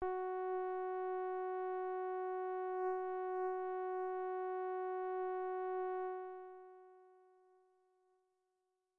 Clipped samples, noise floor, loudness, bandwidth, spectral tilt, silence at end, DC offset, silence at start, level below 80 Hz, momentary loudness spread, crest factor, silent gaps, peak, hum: under 0.1%; -86 dBFS; -41 LUFS; 3.5 kHz; -4 dB/octave; 1.85 s; under 0.1%; 0 s; -78 dBFS; 5 LU; 14 dB; none; -28 dBFS; none